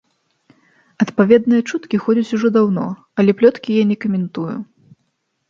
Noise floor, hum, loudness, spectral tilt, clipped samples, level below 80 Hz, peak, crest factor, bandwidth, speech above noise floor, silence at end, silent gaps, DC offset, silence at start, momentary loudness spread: -69 dBFS; none; -16 LUFS; -7.5 dB/octave; under 0.1%; -62 dBFS; 0 dBFS; 16 dB; 7.4 kHz; 54 dB; 0.85 s; none; under 0.1%; 1 s; 11 LU